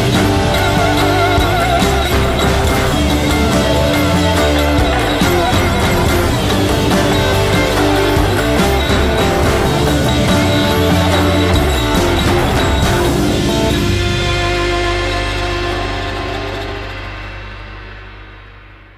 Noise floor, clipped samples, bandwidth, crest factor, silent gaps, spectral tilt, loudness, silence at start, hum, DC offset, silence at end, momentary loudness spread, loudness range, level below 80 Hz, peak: -37 dBFS; under 0.1%; 15.5 kHz; 12 dB; none; -5 dB/octave; -13 LUFS; 0 s; none; under 0.1%; 0.25 s; 8 LU; 5 LU; -22 dBFS; 0 dBFS